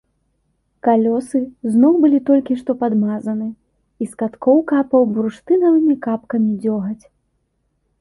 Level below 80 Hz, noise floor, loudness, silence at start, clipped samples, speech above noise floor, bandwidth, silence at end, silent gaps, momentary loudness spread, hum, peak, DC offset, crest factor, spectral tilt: -60 dBFS; -67 dBFS; -17 LUFS; 0.85 s; under 0.1%; 51 dB; 11.5 kHz; 1.05 s; none; 10 LU; none; -2 dBFS; under 0.1%; 14 dB; -8.5 dB/octave